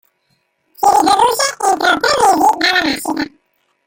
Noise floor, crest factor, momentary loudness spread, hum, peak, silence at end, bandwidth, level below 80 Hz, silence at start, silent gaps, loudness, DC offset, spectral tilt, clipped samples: -64 dBFS; 14 dB; 9 LU; none; 0 dBFS; 0.6 s; 17 kHz; -50 dBFS; 0.8 s; none; -13 LUFS; under 0.1%; -1.5 dB/octave; under 0.1%